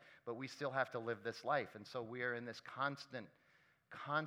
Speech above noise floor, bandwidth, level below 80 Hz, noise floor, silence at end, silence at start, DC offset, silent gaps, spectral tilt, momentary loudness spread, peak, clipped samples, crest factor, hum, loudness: 30 dB; 15.5 kHz; under -90 dBFS; -74 dBFS; 0 s; 0 s; under 0.1%; none; -5.5 dB/octave; 12 LU; -22 dBFS; under 0.1%; 22 dB; none; -44 LUFS